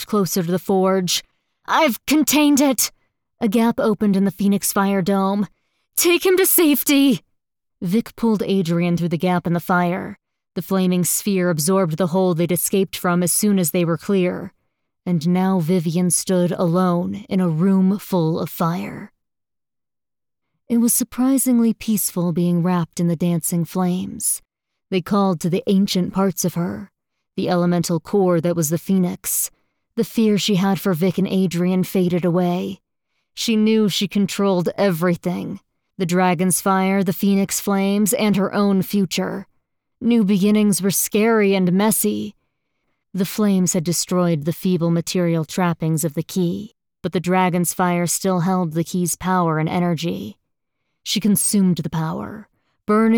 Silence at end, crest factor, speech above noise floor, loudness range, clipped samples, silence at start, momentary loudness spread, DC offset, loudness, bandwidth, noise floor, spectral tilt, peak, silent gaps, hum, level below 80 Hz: 0 s; 16 dB; over 72 dB; 3 LU; under 0.1%; 0 s; 9 LU; under 0.1%; -19 LUFS; over 20 kHz; under -90 dBFS; -5 dB/octave; -4 dBFS; none; none; -58 dBFS